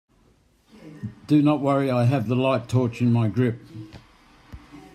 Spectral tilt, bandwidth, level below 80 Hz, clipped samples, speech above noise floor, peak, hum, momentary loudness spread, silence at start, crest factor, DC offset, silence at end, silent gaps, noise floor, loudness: -8.5 dB/octave; 9.8 kHz; -56 dBFS; under 0.1%; 39 dB; -8 dBFS; none; 18 LU; 0.85 s; 16 dB; under 0.1%; 0.15 s; none; -60 dBFS; -22 LUFS